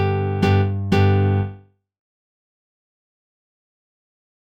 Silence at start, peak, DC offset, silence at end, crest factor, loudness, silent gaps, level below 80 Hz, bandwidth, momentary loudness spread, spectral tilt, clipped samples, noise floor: 0 s; -4 dBFS; under 0.1%; 2.9 s; 18 dB; -19 LUFS; none; -54 dBFS; 6.6 kHz; 6 LU; -8 dB/octave; under 0.1%; -42 dBFS